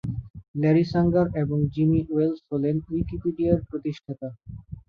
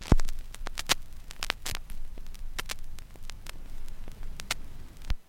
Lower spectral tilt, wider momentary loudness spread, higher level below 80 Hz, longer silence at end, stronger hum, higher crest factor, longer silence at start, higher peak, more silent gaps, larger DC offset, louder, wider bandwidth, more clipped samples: first, -10 dB/octave vs -3 dB/octave; second, 15 LU vs 18 LU; second, -44 dBFS vs -34 dBFS; about the same, 0.1 s vs 0.05 s; neither; second, 18 dB vs 26 dB; about the same, 0.05 s vs 0 s; about the same, -6 dBFS vs -4 dBFS; first, 0.30-0.34 s, 0.48-0.54 s vs none; neither; first, -24 LUFS vs -35 LUFS; second, 6.4 kHz vs 16.5 kHz; neither